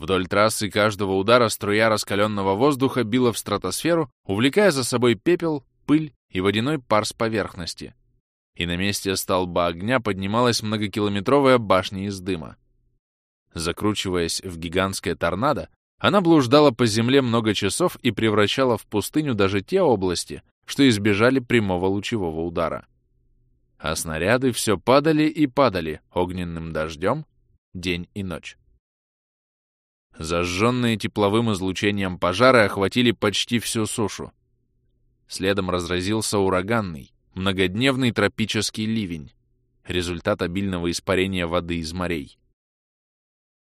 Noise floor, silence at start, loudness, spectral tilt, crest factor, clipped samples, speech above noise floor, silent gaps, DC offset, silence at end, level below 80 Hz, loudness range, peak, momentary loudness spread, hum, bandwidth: -67 dBFS; 0 s; -22 LUFS; -5 dB/octave; 20 dB; under 0.1%; 45 dB; 4.12-4.24 s, 6.16-6.29 s, 8.20-8.53 s, 12.99-13.46 s, 15.76-15.98 s, 20.51-20.62 s, 27.58-27.72 s, 28.79-30.10 s; under 0.1%; 1.35 s; -50 dBFS; 6 LU; -2 dBFS; 11 LU; none; 15.5 kHz